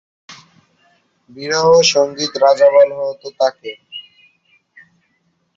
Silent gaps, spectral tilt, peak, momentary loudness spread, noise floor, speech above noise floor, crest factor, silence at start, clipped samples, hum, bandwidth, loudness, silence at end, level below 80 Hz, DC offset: none; -2.5 dB/octave; 0 dBFS; 22 LU; -64 dBFS; 50 dB; 16 dB; 0.3 s; under 0.1%; none; 7.6 kHz; -13 LUFS; 1.55 s; -62 dBFS; under 0.1%